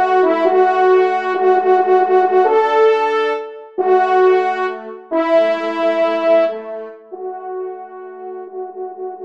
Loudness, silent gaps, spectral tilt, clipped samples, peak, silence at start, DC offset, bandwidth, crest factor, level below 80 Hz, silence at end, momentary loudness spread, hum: -14 LUFS; none; -5 dB/octave; under 0.1%; -2 dBFS; 0 s; 0.2%; 7 kHz; 14 dB; -72 dBFS; 0 s; 17 LU; none